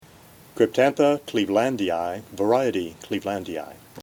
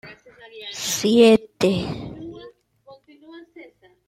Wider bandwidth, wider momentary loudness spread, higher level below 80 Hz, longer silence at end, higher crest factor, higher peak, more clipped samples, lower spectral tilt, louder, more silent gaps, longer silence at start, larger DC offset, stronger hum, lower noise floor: first, 18.5 kHz vs 16.5 kHz; second, 13 LU vs 23 LU; second, -64 dBFS vs -54 dBFS; second, 0 s vs 0.45 s; about the same, 18 dB vs 20 dB; about the same, -6 dBFS vs -4 dBFS; neither; about the same, -5.5 dB/octave vs -4.5 dB/octave; second, -23 LUFS vs -19 LUFS; neither; first, 0.55 s vs 0.05 s; neither; neither; about the same, -50 dBFS vs -50 dBFS